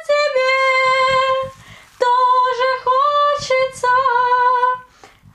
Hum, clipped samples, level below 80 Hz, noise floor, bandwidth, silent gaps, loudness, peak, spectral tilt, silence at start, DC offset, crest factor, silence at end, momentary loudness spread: none; under 0.1%; -56 dBFS; -46 dBFS; 11.5 kHz; none; -15 LUFS; -4 dBFS; -1.5 dB/octave; 0 s; under 0.1%; 12 dB; 0.55 s; 6 LU